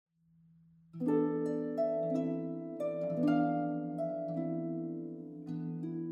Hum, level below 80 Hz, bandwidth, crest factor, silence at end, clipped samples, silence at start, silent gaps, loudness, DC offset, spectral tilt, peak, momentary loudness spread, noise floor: none; -80 dBFS; 7.4 kHz; 16 dB; 0 s; under 0.1%; 0.95 s; none; -35 LUFS; under 0.1%; -10 dB/octave; -18 dBFS; 10 LU; -66 dBFS